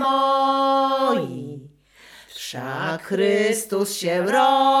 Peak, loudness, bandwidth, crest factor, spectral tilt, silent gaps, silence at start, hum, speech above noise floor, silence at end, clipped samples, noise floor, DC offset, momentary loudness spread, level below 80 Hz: -6 dBFS; -20 LUFS; 16.5 kHz; 14 dB; -4 dB/octave; none; 0 s; none; 29 dB; 0 s; under 0.1%; -50 dBFS; under 0.1%; 16 LU; -68 dBFS